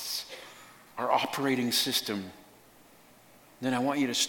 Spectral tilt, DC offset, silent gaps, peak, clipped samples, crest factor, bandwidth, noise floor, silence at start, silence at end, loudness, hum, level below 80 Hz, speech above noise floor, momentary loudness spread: -2.5 dB/octave; under 0.1%; none; -10 dBFS; under 0.1%; 22 dB; 17.5 kHz; -57 dBFS; 0 s; 0 s; -29 LUFS; none; -74 dBFS; 28 dB; 19 LU